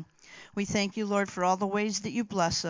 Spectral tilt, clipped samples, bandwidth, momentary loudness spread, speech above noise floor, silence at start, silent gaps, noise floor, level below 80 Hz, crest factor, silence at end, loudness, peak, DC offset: -4 dB/octave; under 0.1%; 7.6 kHz; 11 LU; 23 dB; 0 s; none; -52 dBFS; -58 dBFS; 18 dB; 0 s; -30 LUFS; -12 dBFS; under 0.1%